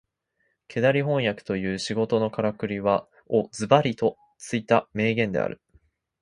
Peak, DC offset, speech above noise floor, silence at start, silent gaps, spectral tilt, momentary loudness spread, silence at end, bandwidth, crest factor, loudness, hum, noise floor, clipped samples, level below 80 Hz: -2 dBFS; under 0.1%; 49 dB; 0.7 s; none; -6 dB/octave; 10 LU; 0.65 s; 11.5 kHz; 24 dB; -25 LUFS; none; -73 dBFS; under 0.1%; -58 dBFS